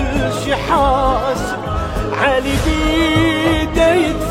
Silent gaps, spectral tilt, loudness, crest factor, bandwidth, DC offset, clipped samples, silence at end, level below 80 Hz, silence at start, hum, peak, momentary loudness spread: none; -5.5 dB/octave; -16 LUFS; 14 dB; 16.5 kHz; under 0.1%; under 0.1%; 0 s; -24 dBFS; 0 s; none; -2 dBFS; 7 LU